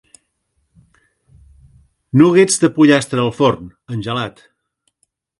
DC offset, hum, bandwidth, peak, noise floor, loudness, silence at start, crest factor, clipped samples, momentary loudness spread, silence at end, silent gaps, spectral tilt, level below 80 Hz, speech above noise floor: under 0.1%; none; 11.5 kHz; 0 dBFS; -68 dBFS; -14 LUFS; 2.15 s; 18 dB; under 0.1%; 16 LU; 1.1 s; none; -5 dB/octave; -52 dBFS; 55 dB